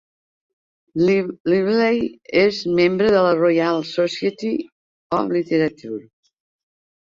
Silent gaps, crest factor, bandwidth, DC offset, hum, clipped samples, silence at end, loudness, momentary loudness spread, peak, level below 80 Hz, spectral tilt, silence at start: 1.40-1.45 s, 4.72-5.10 s; 16 dB; 7.6 kHz; under 0.1%; none; under 0.1%; 1 s; -19 LUFS; 9 LU; -4 dBFS; -58 dBFS; -6.5 dB/octave; 0.95 s